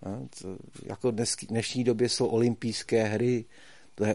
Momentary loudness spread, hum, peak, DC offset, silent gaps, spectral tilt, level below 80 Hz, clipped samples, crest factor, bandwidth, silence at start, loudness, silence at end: 16 LU; none; -12 dBFS; 0.2%; none; -5 dB/octave; -64 dBFS; under 0.1%; 16 dB; 11.5 kHz; 0 s; -28 LUFS; 0 s